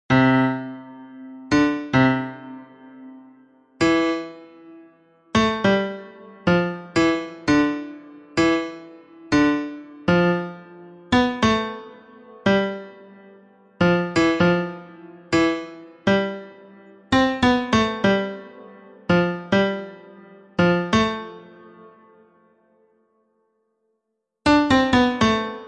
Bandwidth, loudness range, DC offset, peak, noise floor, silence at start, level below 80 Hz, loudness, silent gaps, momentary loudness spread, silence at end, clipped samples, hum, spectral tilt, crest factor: 9.8 kHz; 4 LU; under 0.1%; -4 dBFS; -77 dBFS; 0.1 s; -50 dBFS; -21 LUFS; none; 20 LU; 0 s; under 0.1%; none; -6 dB/octave; 18 dB